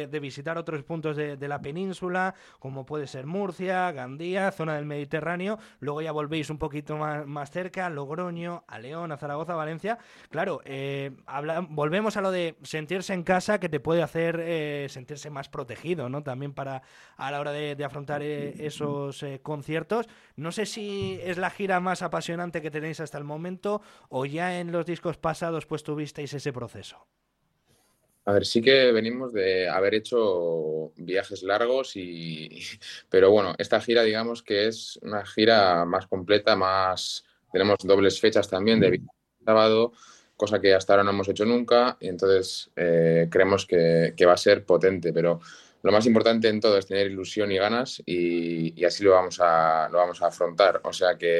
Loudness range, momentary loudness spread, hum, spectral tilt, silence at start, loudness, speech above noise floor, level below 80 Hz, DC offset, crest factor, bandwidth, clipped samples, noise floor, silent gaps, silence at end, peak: 11 LU; 15 LU; none; -5 dB/octave; 0 s; -25 LUFS; 48 dB; -64 dBFS; under 0.1%; 20 dB; 12.5 kHz; under 0.1%; -74 dBFS; none; 0 s; -4 dBFS